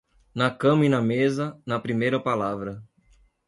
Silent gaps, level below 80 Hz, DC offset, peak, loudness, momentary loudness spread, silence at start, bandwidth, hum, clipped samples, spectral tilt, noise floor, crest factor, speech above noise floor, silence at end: none; -60 dBFS; under 0.1%; -6 dBFS; -24 LUFS; 14 LU; 0.35 s; 11.5 kHz; none; under 0.1%; -7 dB/octave; -60 dBFS; 18 dB; 37 dB; 0.65 s